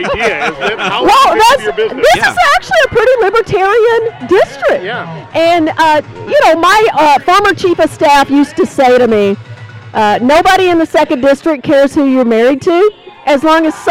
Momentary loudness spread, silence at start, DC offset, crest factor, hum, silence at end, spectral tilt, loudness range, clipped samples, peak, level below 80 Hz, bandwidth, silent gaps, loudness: 7 LU; 0 s; under 0.1%; 8 dB; none; 0 s; -4 dB/octave; 2 LU; under 0.1%; -2 dBFS; -40 dBFS; 16.5 kHz; none; -9 LUFS